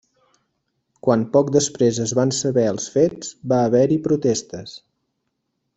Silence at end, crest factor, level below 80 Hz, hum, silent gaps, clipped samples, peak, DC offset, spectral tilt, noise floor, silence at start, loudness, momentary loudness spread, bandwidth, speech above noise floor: 1 s; 18 dB; -58 dBFS; none; none; under 0.1%; -2 dBFS; under 0.1%; -5.5 dB/octave; -75 dBFS; 1.05 s; -19 LUFS; 9 LU; 8.4 kHz; 56 dB